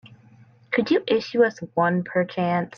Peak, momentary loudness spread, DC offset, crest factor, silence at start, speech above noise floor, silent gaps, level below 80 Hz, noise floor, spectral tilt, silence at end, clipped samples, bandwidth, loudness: -8 dBFS; 4 LU; under 0.1%; 16 dB; 0.05 s; 30 dB; none; -68 dBFS; -52 dBFS; -7 dB/octave; 0.1 s; under 0.1%; 6.8 kHz; -23 LUFS